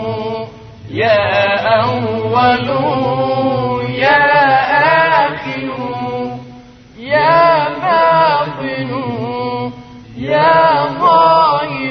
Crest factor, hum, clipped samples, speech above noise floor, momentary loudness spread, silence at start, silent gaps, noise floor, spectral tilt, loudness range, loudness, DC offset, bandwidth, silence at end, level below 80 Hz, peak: 14 dB; none; under 0.1%; 24 dB; 13 LU; 0 s; none; -37 dBFS; -7.5 dB/octave; 2 LU; -13 LUFS; under 0.1%; 6.2 kHz; 0 s; -48 dBFS; 0 dBFS